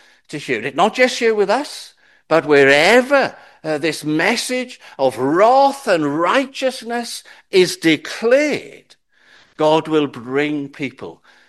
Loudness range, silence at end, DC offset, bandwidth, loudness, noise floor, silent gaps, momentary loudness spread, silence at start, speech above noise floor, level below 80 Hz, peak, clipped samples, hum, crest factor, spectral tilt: 4 LU; 0.35 s; under 0.1%; 12.5 kHz; -16 LUFS; -51 dBFS; none; 16 LU; 0.3 s; 35 dB; -66 dBFS; 0 dBFS; under 0.1%; none; 18 dB; -4 dB/octave